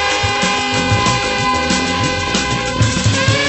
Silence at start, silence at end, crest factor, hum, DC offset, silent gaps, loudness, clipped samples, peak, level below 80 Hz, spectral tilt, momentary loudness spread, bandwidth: 0 s; 0 s; 14 dB; none; under 0.1%; none; -15 LUFS; under 0.1%; 0 dBFS; -32 dBFS; -3.5 dB/octave; 2 LU; 8.4 kHz